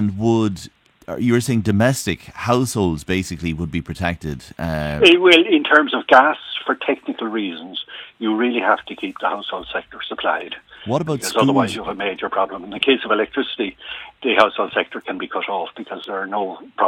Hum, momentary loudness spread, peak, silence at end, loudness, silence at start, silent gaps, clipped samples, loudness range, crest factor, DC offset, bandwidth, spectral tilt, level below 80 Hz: none; 15 LU; 0 dBFS; 0 s; -19 LUFS; 0 s; none; under 0.1%; 7 LU; 20 dB; under 0.1%; 17 kHz; -5 dB/octave; -46 dBFS